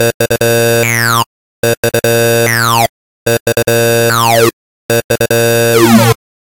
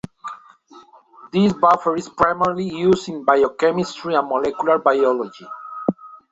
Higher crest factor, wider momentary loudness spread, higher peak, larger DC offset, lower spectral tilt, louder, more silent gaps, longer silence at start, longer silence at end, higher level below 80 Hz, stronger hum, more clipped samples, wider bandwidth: second, 10 dB vs 20 dB; second, 7 LU vs 17 LU; about the same, 0 dBFS vs 0 dBFS; first, 1% vs under 0.1%; second, -4 dB/octave vs -6.5 dB/octave; first, -10 LUFS vs -19 LUFS; first, 0.14-0.20 s, 1.26-1.63 s, 1.77-1.83 s, 2.89-3.26 s, 3.40-3.46 s, 4.53-4.89 s, 5.04-5.09 s vs none; second, 0 s vs 0.25 s; first, 0.4 s vs 0.15 s; first, -42 dBFS vs -56 dBFS; neither; neither; first, 17.5 kHz vs 8 kHz